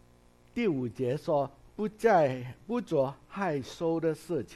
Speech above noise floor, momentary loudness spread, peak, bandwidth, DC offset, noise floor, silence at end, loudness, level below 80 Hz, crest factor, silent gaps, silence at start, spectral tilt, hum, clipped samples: 30 dB; 12 LU; -12 dBFS; 13 kHz; under 0.1%; -60 dBFS; 0 s; -31 LUFS; -62 dBFS; 18 dB; none; 0.55 s; -7 dB/octave; none; under 0.1%